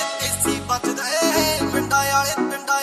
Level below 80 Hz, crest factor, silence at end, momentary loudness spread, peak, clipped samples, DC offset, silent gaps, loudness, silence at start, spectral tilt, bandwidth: -46 dBFS; 14 dB; 0 s; 5 LU; -6 dBFS; under 0.1%; under 0.1%; none; -20 LUFS; 0 s; -2.5 dB/octave; 15 kHz